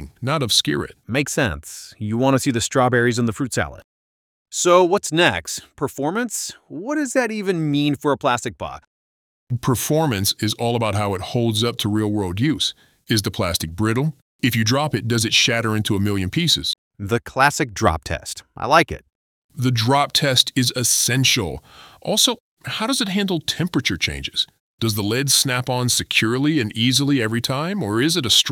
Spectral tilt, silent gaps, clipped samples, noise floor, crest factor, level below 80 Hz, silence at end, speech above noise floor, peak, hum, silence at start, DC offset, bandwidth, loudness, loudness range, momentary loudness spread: -3.5 dB/octave; 3.84-4.46 s, 8.87-9.47 s, 14.22-14.39 s, 16.78-16.91 s, 19.15-19.49 s, 22.40-22.57 s, 24.60-24.78 s; under 0.1%; under -90 dBFS; 20 dB; -48 dBFS; 0 s; over 70 dB; -2 dBFS; none; 0 s; under 0.1%; 19.5 kHz; -19 LUFS; 4 LU; 11 LU